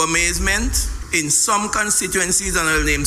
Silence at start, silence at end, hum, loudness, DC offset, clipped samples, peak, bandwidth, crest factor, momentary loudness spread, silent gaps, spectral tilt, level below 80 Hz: 0 s; 0 s; none; -17 LUFS; under 0.1%; under 0.1%; -2 dBFS; 16 kHz; 16 dB; 6 LU; none; -2 dB/octave; -28 dBFS